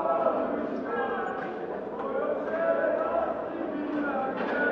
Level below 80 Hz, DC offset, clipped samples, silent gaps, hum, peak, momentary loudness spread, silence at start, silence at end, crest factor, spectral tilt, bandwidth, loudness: -64 dBFS; under 0.1%; under 0.1%; none; none; -12 dBFS; 7 LU; 0 s; 0 s; 16 dB; -7.5 dB/octave; 6.8 kHz; -30 LUFS